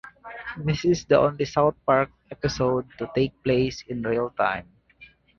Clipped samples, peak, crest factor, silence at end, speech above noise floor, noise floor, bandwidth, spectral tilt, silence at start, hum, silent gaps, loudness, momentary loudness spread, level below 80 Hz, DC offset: under 0.1%; -6 dBFS; 20 dB; 0.35 s; 29 dB; -53 dBFS; 7.4 kHz; -6 dB/octave; 0.05 s; none; none; -24 LUFS; 10 LU; -50 dBFS; under 0.1%